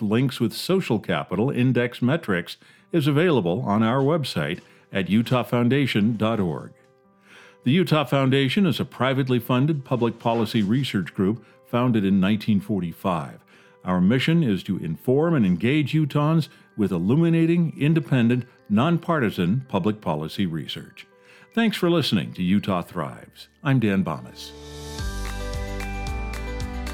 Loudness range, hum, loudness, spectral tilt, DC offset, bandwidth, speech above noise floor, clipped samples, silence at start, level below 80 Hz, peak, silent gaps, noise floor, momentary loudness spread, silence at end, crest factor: 4 LU; none; -23 LUFS; -7 dB/octave; under 0.1%; 17 kHz; 35 dB; under 0.1%; 0 s; -42 dBFS; -6 dBFS; none; -57 dBFS; 11 LU; 0 s; 16 dB